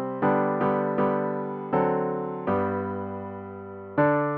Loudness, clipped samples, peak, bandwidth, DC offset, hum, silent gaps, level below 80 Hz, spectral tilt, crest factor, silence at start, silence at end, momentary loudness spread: -26 LUFS; under 0.1%; -10 dBFS; 4.6 kHz; under 0.1%; none; none; -64 dBFS; -11 dB/octave; 16 dB; 0 s; 0 s; 12 LU